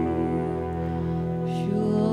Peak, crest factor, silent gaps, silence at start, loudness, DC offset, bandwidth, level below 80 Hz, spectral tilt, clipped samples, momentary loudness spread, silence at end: -14 dBFS; 12 dB; none; 0 s; -27 LUFS; under 0.1%; 10 kHz; -44 dBFS; -9 dB/octave; under 0.1%; 4 LU; 0 s